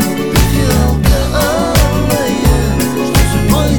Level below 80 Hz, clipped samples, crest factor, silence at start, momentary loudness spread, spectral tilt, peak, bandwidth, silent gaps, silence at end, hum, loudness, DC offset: -16 dBFS; under 0.1%; 10 dB; 0 s; 2 LU; -5.5 dB/octave; 0 dBFS; over 20 kHz; none; 0 s; none; -12 LUFS; 2%